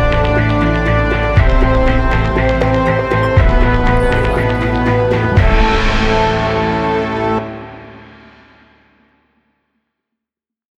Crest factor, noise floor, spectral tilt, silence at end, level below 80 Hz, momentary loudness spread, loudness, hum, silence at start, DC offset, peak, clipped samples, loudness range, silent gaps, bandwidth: 14 dB; -84 dBFS; -7 dB/octave; 2.75 s; -18 dBFS; 4 LU; -14 LUFS; none; 0 s; under 0.1%; 0 dBFS; under 0.1%; 8 LU; none; 9.6 kHz